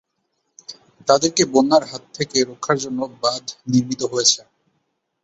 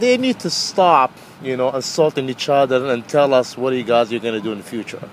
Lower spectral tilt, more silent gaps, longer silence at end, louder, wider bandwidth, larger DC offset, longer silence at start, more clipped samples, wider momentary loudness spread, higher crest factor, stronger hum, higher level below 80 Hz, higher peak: about the same, -3.5 dB/octave vs -4 dB/octave; neither; first, 0.85 s vs 0 s; about the same, -19 LUFS vs -18 LUFS; second, 8.4 kHz vs 15.5 kHz; neither; first, 0.7 s vs 0 s; neither; first, 17 LU vs 12 LU; about the same, 20 dB vs 18 dB; neither; about the same, -62 dBFS vs -66 dBFS; about the same, -2 dBFS vs 0 dBFS